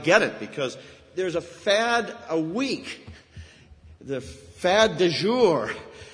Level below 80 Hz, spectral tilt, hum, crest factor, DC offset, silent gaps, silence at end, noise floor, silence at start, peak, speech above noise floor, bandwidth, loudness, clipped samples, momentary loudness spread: -56 dBFS; -4 dB/octave; none; 24 dB; under 0.1%; none; 0 s; -50 dBFS; 0 s; -2 dBFS; 25 dB; 11 kHz; -24 LUFS; under 0.1%; 17 LU